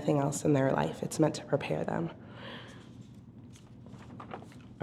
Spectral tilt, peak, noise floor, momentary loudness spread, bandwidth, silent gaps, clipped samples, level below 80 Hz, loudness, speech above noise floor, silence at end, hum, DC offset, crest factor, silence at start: -6 dB/octave; -12 dBFS; -51 dBFS; 23 LU; 14 kHz; none; under 0.1%; -62 dBFS; -31 LUFS; 21 dB; 0 s; none; under 0.1%; 22 dB; 0 s